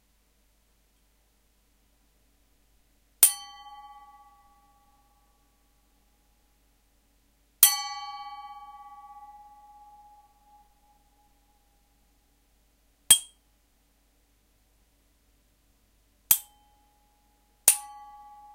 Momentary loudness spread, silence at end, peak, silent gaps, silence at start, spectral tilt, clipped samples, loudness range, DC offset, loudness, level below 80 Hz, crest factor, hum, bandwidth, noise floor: 29 LU; 0.7 s; -2 dBFS; none; 3.2 s; 2.5 dB/octave; under 0.1%; 4 LU; under 0.1%; -22 LUFS; -66 dBFS; 32 dB; none; 16 kHz; -67 dBFS